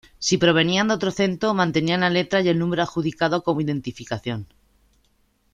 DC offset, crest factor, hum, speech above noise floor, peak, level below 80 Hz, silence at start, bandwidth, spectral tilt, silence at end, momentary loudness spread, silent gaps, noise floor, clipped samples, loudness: under 0.1%; 18 dB; none; 43 dB; -4 dBFS; -54 dBFS; 0.2 s; 9.8 kHz; -5 dB/octave; 1.1 s; 11 LU; none; -64 dBFS; under 0.1%; -21 LUFS